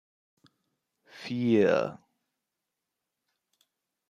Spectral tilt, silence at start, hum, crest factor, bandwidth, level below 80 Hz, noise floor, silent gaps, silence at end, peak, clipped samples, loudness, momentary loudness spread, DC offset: -7 dB/octave; 1.15 s; none; 22 dB; 9.4 kHz; -78 dBFS; -86 dBFS; none; 2.15 s; -12 dBFS; under 0.1%; -27 LUFS; 14 LU; under 0.1%